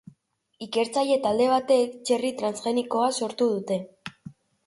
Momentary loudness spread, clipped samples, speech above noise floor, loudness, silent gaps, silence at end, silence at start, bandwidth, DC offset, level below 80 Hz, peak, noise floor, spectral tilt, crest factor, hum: 12 LU; under 0.1%; 41 dB; -25 LUFS; none; 0.35 s; 0.6 s; 11.5 kHz; under 0.1%; -70 dBFS; -10 dBFS; -65 dBFS; -4 dB/octave; 16 dB; none